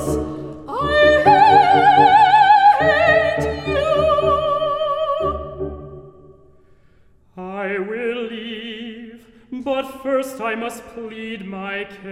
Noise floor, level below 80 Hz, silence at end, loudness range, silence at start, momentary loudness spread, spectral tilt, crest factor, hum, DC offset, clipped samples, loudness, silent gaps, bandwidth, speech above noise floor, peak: -52 dBFS; -42 dBFS; 0 s; 16 LU; 0 s; 20 LU; -5 dB/octave; 16 dB; none; under 0.1%; under 0.1%; -16 LUFS; none; 14 kHz; 26 dB; -2 dBFS